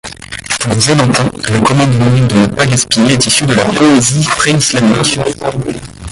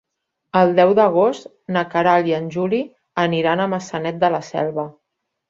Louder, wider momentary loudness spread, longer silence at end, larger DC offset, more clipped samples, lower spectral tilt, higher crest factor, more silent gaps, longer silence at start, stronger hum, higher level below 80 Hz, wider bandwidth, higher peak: first, -10 LUFS vs -19 LUFS; about the same, 9 LU vs 11 LU; second, 0 s vs 0.6 s; neither; neither; second, -4 dB/octave vs -6.5 dB/octave; second, 10 dB vs 18 dB; neither; second, 0.05 s vs 0.55 s; neither; first, -36 dBFS vs -62 dBFS; first, 11.5 kHz vs 7.8 kHz; about the same, 0 dBFS vs -2 dBFS